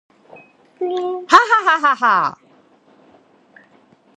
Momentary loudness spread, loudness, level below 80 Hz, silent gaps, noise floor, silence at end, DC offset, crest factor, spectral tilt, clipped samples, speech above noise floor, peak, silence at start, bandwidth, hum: 12 LU; -15 LUFS; -66 dBFS; none; -53 dBFS; 1.85 s; under 0.1%; 20 dB; -2.5 dB/octave; under 0.1%; 38 dB; 0 dBFS; 0.8 s; 11 kHz; none